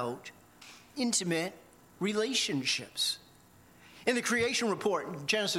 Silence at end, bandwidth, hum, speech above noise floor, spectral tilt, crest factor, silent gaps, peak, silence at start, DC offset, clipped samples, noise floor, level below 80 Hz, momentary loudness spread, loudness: 0 s; 16.5 kHz; 60 Hz at -60 dBFS; 28 dB; -2.5 dB/octave; 18 dB; none; -14 dBFS; 0 s; under 0.1%; under 0.1%; -59 dBFS; -72 dBFS; 15 LU; -31 LUFS